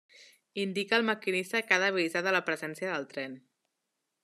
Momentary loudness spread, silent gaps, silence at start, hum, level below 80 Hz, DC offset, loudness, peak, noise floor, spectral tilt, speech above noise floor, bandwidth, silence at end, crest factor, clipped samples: 13 LU; none; 0.2 s; none; -86 dBFS; under 0.1%; -30 LUFS; -10 dBFS; -84 dBFS; -4 dB/octave; 53 dB; 13.5 kHz; 0.85 s; 22 dB; under 0.1%